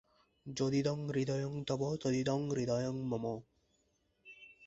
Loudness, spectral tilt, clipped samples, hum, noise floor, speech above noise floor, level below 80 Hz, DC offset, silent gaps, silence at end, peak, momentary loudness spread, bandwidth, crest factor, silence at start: -36 LUFS; -6.5 dB/octave; under 0.1%; none; -77 dBFS; 42 dB; -68 dBFS; under 0.1%; none; 0 s; -20 dBFS; 17 LU; 8 kHz; 16 dB; 0.45 s